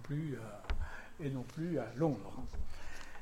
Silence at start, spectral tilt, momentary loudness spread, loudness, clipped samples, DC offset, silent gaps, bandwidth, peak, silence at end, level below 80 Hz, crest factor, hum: 0 s; -7.5 dB/octave; 12 LU; -41 LUFS; under 0.1%; under 0.1%; none; 12.5 kHz; -20 dBFS; 0 s; -46 dBFS; 18 dB; none